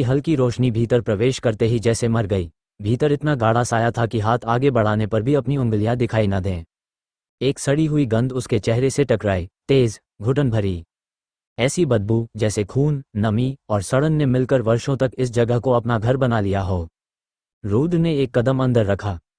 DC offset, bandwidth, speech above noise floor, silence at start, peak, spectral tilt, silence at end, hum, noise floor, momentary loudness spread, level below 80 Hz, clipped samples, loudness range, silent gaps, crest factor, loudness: under 0.1%; 10.5 kHz; over 71 dB; 0 s; -4 dBFS; -7 dB/octave; 0.2 s; none; under -90 dBFS; 6 LU; -44 dBFS; under 0.1%; 2 LU; 7.29-7.38 s, 11.47-11.56 s, 17.53-17.61 s; 16 dB; -20 LUFS